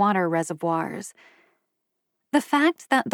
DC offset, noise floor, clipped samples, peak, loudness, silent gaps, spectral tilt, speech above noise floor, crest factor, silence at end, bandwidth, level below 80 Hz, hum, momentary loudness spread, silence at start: under 0.1%; -79 dBFS; under 0.1%; -8 dBFS; -24 LUFS; none; -5 dB/octave; 56 dB; 18 dB; 0 s; 17.5 kHz; -86 dBFS; none; 12 LU; 0 s